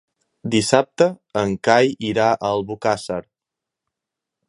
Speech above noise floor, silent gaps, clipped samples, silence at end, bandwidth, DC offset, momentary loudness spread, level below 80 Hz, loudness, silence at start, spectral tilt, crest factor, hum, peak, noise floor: 67 dB; none; under 0.1%; 1.25 s; 11.5 kHz; under 0.1%; 8 LU; -56 dBFS; -19 LUFS; 0.45 s; -4.5 dB/octave; 20 dB; none; 0 dBFS; -85 dBFS